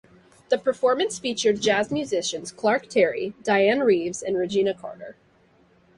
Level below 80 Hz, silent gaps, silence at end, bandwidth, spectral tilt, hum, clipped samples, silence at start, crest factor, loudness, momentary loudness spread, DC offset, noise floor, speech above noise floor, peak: -64 dBFS; none; 0.85 s; 11.5 kHz; -3.5 dB/octave; none; under 0.1%; 0.5 s; 16 dB; -23 LUFS; 9 LU; under 0.1%; -59 dBFS; 36 dB; -8 dBFS